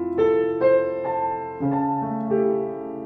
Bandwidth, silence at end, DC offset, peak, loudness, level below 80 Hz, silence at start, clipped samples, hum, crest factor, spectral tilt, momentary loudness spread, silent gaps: 4.6 kHz; 0 s; under 0.1%; -8 dBFS; -23 LUFS; -60 dBFS; 0 s; under 0.1%; none; 14 dB; -10 dB/octave; 7 LU; none